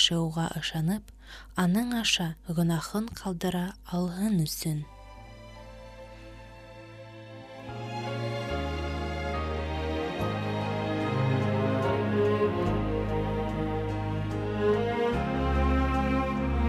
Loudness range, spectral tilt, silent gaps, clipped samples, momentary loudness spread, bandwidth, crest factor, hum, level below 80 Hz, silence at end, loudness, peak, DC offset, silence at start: 9 LU; -5.5 dB/octave; none; under 0.1%; 20 LU; 15.5 kHz; 20 dB; none; -38 dBFS; 0 s; -29 LUFS; -10 dBFS; under 0.1%; 0 s